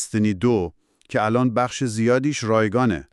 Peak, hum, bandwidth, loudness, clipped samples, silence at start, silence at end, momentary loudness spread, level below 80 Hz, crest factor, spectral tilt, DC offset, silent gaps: -6 dBFS; none; 12 kHz; -21 LUFS; under 0.1%; 0 s; 0.1 s; 4 LU; -50 dBFS; 16 dB; -6 dB/octave; under 0.1%; none